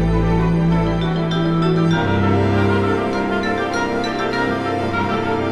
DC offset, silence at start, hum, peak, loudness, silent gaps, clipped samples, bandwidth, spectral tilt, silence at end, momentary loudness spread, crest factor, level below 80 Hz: under 0.1%; 0 s; none; -4 dBFS; -18 LUFS; none; under 0.1%; 10 kHz; -7.5 dB/octave; 0 s; 4 LU; 12 dB; -32 dBFS